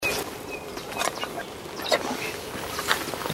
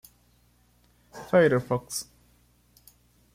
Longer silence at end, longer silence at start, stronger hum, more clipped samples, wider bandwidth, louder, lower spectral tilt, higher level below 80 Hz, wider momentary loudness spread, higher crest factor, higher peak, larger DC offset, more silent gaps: second, 0 s vs 1.3 s; second, 0 s vs 1.15 s; second, none vs 60 Hz at -50 dBFS; neither; about the same, 16.5 kHz vs 16 kHz; second, -29 LUFS vs -25 LUFS; second, -2.5 dB/octave vs -5.5 dB/octave; first, -54 dBFS vs -62 dBFS; second, 9 LU vs 25 LU; first, 30 dB vs 20 dB; first, 0 dBFS vs -10 dBFS; neither; neither